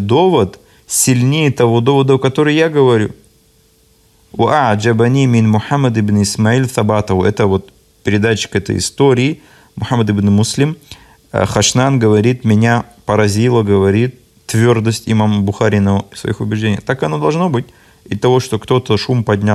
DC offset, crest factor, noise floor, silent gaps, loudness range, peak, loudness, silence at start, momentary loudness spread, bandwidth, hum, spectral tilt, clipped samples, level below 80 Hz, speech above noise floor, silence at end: under 0.1%; 12 dB; -51 dBFS; none; 3 LU; 0 dBFS; -13 LUFS; 0 s; 7 LU; 14 kHz; none; -5.5 dB/octave; under 0.1%; -46 dBFS; 39 dB; 0 s